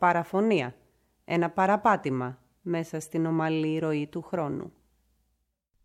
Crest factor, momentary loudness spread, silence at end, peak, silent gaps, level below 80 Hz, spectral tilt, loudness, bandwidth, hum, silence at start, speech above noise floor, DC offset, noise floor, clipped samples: 20 dB; 12 LU; 1.15 s; -10 dBFS; none; -68 dBFS; -6.5 dB/octave; -28 LUFS; 15 kHz; none; 0 s; 49 dB; under 0.1%; -76 dBFS; under 0.1%